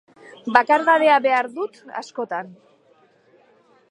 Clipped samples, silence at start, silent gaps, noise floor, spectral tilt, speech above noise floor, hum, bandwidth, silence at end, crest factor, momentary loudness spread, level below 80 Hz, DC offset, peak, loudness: under 0.1%; 0.45 s; none; -57 dBFS; -4 dB/octave; 38 dB; none; 11 kHz; 1.4 s; 22 dB; 18 LU; -70 dBFS; under 0.1%; 0 dBFS; -19 LUFS